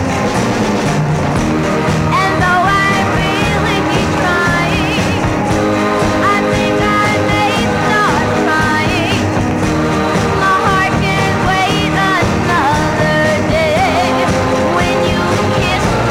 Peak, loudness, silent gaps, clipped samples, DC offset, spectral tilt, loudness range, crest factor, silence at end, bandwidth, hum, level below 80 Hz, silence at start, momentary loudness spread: 0 dBFS; -13 LUFS; none; under 0.1%; under 0.1%; -5 dB/octave; 1 LU; 12 dB; 0 s; 16.5 kHz; none; -30 dBFS; 0 s; 3 LU